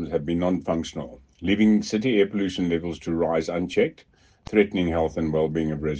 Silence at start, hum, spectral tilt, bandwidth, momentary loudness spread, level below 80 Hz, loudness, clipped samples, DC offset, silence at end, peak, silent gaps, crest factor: 0 s; none; -6.5 dB/octave; 8.8 kHz; 7 LU; -50 dBFS; -24 LUFS; under 0.1%; under 0.1%; 0 s; -4 dBFS; none; 20 dB